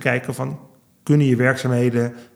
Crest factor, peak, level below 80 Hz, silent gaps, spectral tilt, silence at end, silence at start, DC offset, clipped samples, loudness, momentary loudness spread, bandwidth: 18 dB; -2 dBFS; -68 dBFS; none; -7 dB/octave; 0.1 s; 0 s; under 0.1%; under 0.1%; -20 LUFS; 14 LU; 14.5 kHz